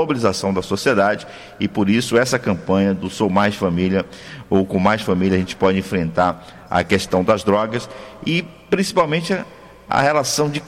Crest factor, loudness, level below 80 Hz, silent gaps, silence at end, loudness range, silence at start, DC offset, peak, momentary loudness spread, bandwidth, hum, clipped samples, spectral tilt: 14 dB; -19 LUFS; -50 dBFS; none; 0 s; 1 LU; 0 s; under 0.1%; -4 dBFS; 8 LU; 15.5 kHz; none; under 0.1%; -5 dB/octave